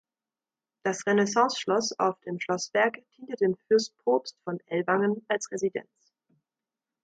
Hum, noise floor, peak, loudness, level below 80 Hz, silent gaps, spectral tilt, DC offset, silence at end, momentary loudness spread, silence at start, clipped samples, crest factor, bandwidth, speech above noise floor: none; under -90 dBFS; -10 dBFS; -27 LUFS; -76 dBFS; none; -4 dB/octave; under 0.1%; 1.2 s; 10 LU; 0.85 s; under 0.1%; 18 dB; 9.2 kHz; over 63 dB